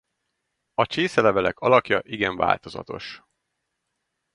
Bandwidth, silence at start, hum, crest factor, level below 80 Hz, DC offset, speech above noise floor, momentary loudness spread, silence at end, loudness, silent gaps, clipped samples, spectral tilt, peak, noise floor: 11 kHz; 0.8 s; none; 22 dB; -56 dBFS; under 0.1%; 56 dB; 16 LU; 1.15 s; -22 LUFS; none; under 0.1%; -5.5 dB/octave; -2 dBFS; -78 dBFS